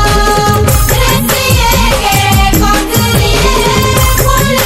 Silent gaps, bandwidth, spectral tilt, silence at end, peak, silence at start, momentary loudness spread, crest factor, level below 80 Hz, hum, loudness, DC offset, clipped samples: none; 16.5 kHz; -4 dB/octave; 0 s; 0 dBFS; 0 s; 1 LU; 8 dB; -14 dBFS; none; -9 LUFS; under 0.1%; 0.3%